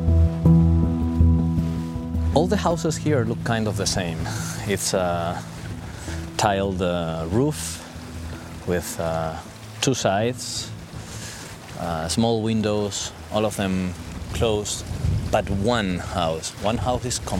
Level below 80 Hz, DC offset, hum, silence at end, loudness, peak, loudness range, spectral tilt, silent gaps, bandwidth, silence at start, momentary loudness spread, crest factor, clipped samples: -34 dBFS; under 0.1%; none; 0 s; -23 LUFS; -2 dBFS; 4 LU; -5.5 dB/octave; none; 16 kHz; 0 s; 14 LU; 20 dB; under 0.1%